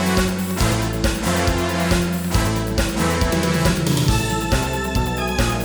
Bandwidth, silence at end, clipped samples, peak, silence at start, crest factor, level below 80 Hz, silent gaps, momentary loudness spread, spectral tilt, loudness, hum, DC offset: over 20 kHz; 0 s; under 0.1%; -4 dBFS; 0 s; 14 dB; -26 dBFS; none; 3 LU; -5 dB/octave; -20 LUFS; none; under 0.1%